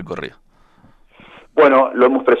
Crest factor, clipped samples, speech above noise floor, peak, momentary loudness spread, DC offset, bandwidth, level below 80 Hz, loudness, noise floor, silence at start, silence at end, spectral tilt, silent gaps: 16 dB; under 0.1%; 36 dB; 0 dBFS; 17 LU; under 0.1%; 6.6 kHz; -54 dBFS; -14 LUFS; -50 dBFS; 0 s; 0 s; -7 dB/octave; none